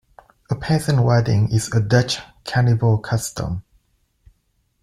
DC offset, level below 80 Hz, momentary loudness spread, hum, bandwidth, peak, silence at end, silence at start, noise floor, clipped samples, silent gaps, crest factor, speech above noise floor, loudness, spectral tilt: under 0.1%; -44 dBFS; 11 LU; none; 13 kHz; -2 dBFS; 1.2 s; 0.5 s; -66 dBFS; under 0.1%; none; 18 dB; 49 dB; -20 LUFS; -6 dB/octave